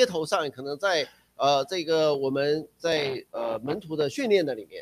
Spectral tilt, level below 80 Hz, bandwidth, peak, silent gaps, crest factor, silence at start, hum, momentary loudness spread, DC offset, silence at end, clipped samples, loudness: -4 dB/octave; -68 dBFS; 15.5 kHz; -6 dBFS; none; 20 dB; 0 s; none; 8 LU; under 0.1%; 0 s; under 0.1%; -27 LUFS